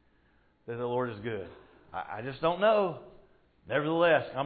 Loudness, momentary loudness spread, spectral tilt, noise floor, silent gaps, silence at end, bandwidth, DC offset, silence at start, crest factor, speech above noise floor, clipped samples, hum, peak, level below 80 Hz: -30 LUFS; 17 LU; -9.5 dB/octave; -67 dBFS; none; 0 s; 4.8 kHz; under 0.1%; 0.65 s; 18 dB; 37 dB; under 0.1%; none; -14 dBFS; -66 dBFS